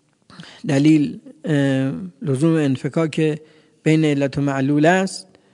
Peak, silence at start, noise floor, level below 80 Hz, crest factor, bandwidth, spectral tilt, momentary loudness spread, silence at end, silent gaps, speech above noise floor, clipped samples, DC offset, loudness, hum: -2 dBFS; 0.4 s; -43 dBFS; -60 dBFS; 18 dB; 11 kHz; -7 dB/octave; 11 LU; 0.3 s; none; 25 dB; under 0.1%; under 0.1%; -19 LUFS; none